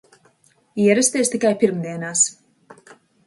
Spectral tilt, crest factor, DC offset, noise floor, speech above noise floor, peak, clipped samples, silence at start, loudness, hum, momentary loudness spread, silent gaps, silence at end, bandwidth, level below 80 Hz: -3.5 dB/octave; 18 dB; under 0.1%; -59 dBFS; 41 dB; -4 dBFS; under 0.1%; 0.75 s; -18 LUFS; none; 8 LU; none; 0.55 s; 11.5 kHz; -68 dBFS